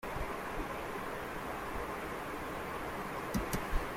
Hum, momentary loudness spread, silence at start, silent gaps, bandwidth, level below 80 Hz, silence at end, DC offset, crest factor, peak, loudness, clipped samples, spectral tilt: none; 3 LU; 0 s; none; 16.5 kHz; -46 dBFS; 0 s; under 0.1%; 18 dB; -20 dBFS; -40 LUFS; under 0.1%; -5 dB/octave